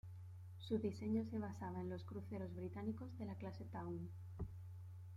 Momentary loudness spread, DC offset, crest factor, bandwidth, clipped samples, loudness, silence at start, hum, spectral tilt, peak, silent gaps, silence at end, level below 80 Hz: 13 LU; under 0.1%; 18 dB; 12 kHz; under 0.1%; -48 LUFS; 0.05 s; none; -8.5 dB/octave; -30 dBFS; none; 0 s; -68 dBFS